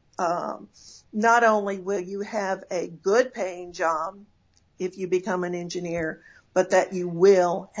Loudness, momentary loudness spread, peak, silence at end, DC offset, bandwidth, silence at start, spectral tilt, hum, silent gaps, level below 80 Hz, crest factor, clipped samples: -25 LUFS; 14 LU; -6 dBFS; 0 s; under 0.1%; 8 kHz; 0.2 s; -5 dB/octave; none; none; -64 dBFS; 18 dB; under 0.1%